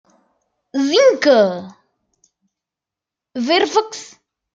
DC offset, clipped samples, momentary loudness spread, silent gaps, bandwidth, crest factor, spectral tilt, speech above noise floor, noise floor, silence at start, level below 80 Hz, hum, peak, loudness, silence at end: under 0.1%; under 0.1%; 18 LU; none; 7.8 kHz; 18 dB; -3.5 dB/octave; 71 dB; -86 dBFS; 0.75 s; -72 dBFS; none; -2 dBFS; -15 LUFS; 0.5 s